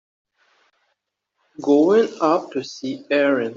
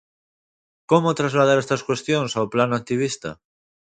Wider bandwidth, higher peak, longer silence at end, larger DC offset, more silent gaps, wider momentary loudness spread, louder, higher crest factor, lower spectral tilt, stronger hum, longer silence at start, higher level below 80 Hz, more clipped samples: second, 7.6 kHz vs 9.4 kHz; about the same, -4 dBFS vs -2 dBFS; second, 0 s vs 0.65 s; neither; neither; first, 14 LU vs 7 LU; about the same, -19 LUFS vs -21 LUFS; about the same, 16 dB vs 20 dB; about the same, -5.5 dB/octave vs -5.5 dB/octave; neither; first, 1.6 s vs 0.9 s; second, -72 dBFS vs -62 dBFS; neither